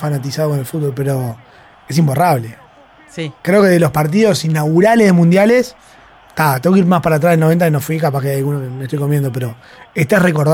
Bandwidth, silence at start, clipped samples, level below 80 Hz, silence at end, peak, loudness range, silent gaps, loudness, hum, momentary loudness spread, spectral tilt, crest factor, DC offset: 17 kHz; 0 s; under 0.1%; -50 dBFS; 0 s; -2 dBFS; 4 LU; none; -14 LUFS; none; 14 LU; -6.5 dB/octave; 12 dB; under 0.1%